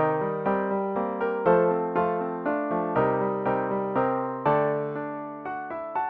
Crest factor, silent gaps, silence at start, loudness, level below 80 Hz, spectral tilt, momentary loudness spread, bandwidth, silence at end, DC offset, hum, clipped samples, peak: 18 dB; none; 0 s; -26 LUFS; -62 dBFS; -10.5 dB/octave; 11 LU; 4.6 kHz; 0 s; under 0.1%; none; under 0.1%; -8 dBFS